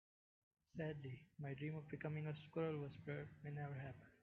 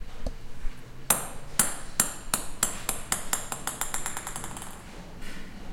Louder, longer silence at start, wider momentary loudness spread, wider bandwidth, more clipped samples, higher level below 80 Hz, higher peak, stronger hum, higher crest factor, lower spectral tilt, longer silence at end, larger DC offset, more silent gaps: second, -50 LUFS vs -29 LUFS; first, 0.75 s vs 0 s; second, 7 LU vs 18 LU; second, 4.5 kHz vs 16.5 kHz; neither; second, -78 dBFS vs -40 dBFS; second, -34 dBFS vs -2 dBFS; neither; second, 16 dB vs 28 dB; first, -7 dB/octave vs -1.5 dB/octave; about the same, 0.1 s vs 0 s; neither; neither